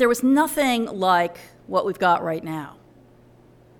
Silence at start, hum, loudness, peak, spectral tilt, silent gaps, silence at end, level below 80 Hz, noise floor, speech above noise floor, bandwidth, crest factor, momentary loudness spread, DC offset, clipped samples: 0 s; none; -21 LUFS; -6 dBFS; -4.5 dB/octave; none; 1.1 s; -60 dBFS; -52 dBFS; 31 dB; 19 kHz; 18 dB; 12 LU; under 0.1%; under 0.1%